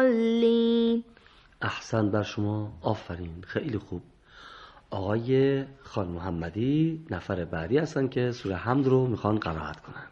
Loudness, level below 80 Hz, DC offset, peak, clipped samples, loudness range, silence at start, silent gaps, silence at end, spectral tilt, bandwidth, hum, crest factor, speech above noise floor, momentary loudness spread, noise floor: -28 LUFS; -54 dBFS; under 0.1%; -8 dBFS; under 0.1%; 4 LU; 0 s; none; 0.05 s; -7.5 dB/octave; 7.6 kHz; none; 18 dB; 29 dB; 15 LU; -56 dBFS